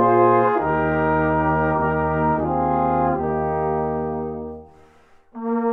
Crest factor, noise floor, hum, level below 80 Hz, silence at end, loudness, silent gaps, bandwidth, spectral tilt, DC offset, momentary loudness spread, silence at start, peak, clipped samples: 16 dB; -52 dBFS; none; -40 dBFS; 0 s; -20 LUFS; none; 4.4 kHz; -10.5 dB/octave; under 0.1%; 11 LU; 0 s; -4 dBFS; under 0.1%